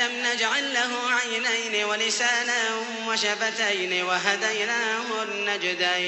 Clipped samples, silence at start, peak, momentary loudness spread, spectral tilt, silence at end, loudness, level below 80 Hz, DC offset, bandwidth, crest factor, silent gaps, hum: under 0.1%; 0 s; -8 dBFS; 4 LU; -0.5 dB/octave; 0 s; -24 LUFS; -82 dBFS; under 0.1%; 8.4 kHz; 18 dB; none; none